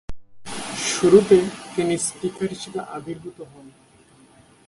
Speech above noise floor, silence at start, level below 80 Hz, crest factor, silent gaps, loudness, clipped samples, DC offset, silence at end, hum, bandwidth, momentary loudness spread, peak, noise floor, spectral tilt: 32 dB; 0.1 s; -50 dBFS; 22 dB; none; -21 LUFS; under 0.1%; under 0.1%; 1 s; none; 11.5 kHz; 23 LU; -2 dBFS; -53 dBFS; -4.5 dB/octave